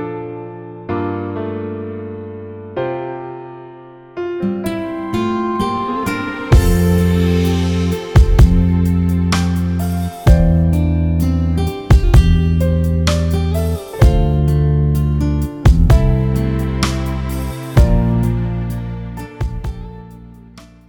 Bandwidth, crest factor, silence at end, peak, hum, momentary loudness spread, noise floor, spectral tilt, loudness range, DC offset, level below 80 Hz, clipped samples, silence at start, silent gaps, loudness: 18.5 kHz; 14 dB; 0.25 s; 0 dBFS; none; 16 LU; -40 dBFS; -7.5 dB/octave; 10 LU; under 0.1%; -20 dBFS; under 0.1%; 0 s; none; -16 LUFS